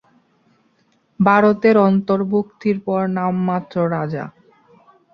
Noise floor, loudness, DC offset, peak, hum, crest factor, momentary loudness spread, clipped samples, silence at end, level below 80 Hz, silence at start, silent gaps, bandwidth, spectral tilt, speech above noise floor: -61 dBFS; -18 LUFS; under 0.1%; -2 dBFS; none; 18 dB; 10 LU; under 0.1%; 0.85 s; -60 dBFS; 1.2 s; none; 6.2 kHz; -9.5 dB/octave; 44 dB